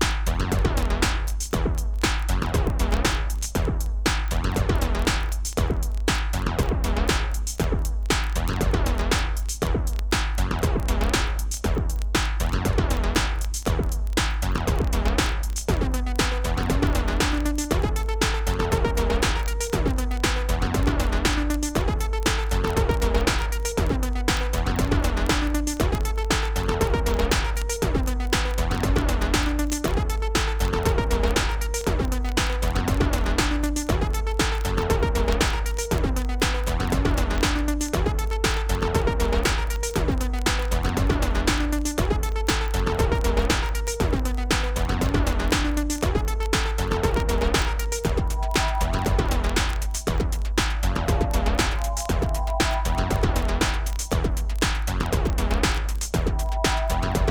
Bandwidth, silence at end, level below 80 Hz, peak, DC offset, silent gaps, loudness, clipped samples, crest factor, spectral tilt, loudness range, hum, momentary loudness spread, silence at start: 19 kHz; 0 s; -24 dBFS; -6 dBFS; under 0.1%; none; -24 LUFS; under 0.1%; 16 dB; -4.5 dB/octave; 1 LU; none; 3 LU; 0 s